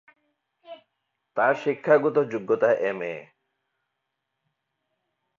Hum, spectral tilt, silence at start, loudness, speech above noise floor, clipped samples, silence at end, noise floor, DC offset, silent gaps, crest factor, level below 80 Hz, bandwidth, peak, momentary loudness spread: none; -7 dB/octave; 0.7 s; -24 LUFS; 58 dB; under 0.1%; 2.15 s; -81 dBFS; under 0.1%; none; 20 dB; -78 dBFS; 7.2 kHz; -6 dBFS; 13 LU